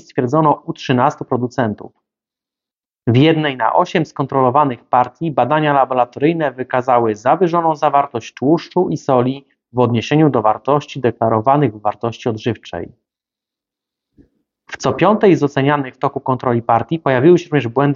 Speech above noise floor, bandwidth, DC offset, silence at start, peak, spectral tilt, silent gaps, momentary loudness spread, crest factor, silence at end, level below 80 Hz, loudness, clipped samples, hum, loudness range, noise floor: 74 dB; 7.4 kHz; under 0.1%; 0.15 s; 0 dBFS; -6 dB/octave; none; 9 LU; 16 dB; 0 s; -56 dBFS; -16 LUFS; under 0.1%; none; 5 LU; -89 dBFS